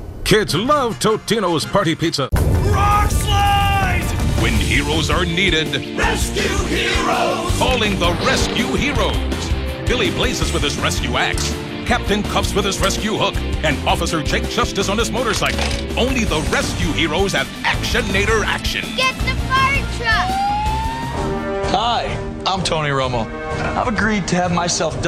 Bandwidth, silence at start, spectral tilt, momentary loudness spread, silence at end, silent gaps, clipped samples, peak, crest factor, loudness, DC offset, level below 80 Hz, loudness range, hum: 16 kHz; 0 s; -4 dB/octave; 5 LU; 0 s; none; under 0.1%; -2 dBFS; 16 dB; -18 LUFS; under 0.1%; -26 dBFS; 2 LU; none